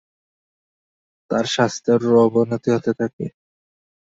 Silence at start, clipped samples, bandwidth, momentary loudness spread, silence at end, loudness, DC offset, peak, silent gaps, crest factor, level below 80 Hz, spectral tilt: 1.3 s; under 0.1%; 8 kHz; 10 LU; 0.85 s; -19 LUFS; under 0.1%; -4 dBFS; 3.13-3.19 s; 18 dB; -62 dBFS; -5.5 dB/octave